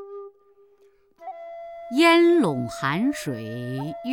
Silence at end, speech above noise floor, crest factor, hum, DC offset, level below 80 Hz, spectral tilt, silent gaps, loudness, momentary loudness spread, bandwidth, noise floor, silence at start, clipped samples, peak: 0 s; 38 dB; 18 dB; none; under 0.1%; -64 dBFS; -5.5 dB/octave; none; -22 LUFS; 24 LU; 15.5 kHz; -59 dBFS; 0 s; under 0.1%; -6 dBFS